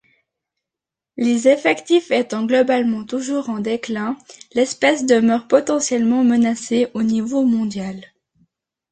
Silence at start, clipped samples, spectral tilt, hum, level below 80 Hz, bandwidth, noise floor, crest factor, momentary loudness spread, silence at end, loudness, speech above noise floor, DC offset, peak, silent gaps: 1.15 s; under 0.1%; -4.5 dB/octave; none; -62 dBFS; 9.4 kHz; -87 dBFS; 16 dB; 9 LU; 0.85 s; -18 LUFS; 69 dB; under 0.1%; -2 dBFS; none